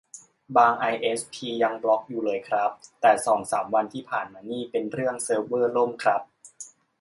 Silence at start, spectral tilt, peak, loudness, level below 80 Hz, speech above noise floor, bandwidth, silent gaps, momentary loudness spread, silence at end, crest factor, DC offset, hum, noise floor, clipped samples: 0.15 s; -3.5 dB/octave; -6 dBFS; -25 LUFS; -72 dBFS; 23 dB; 11.5 kHz; none; 11 LU; 0.35 s; 20 dB; under 0.1%; none; -47 dBFS; under 0.1%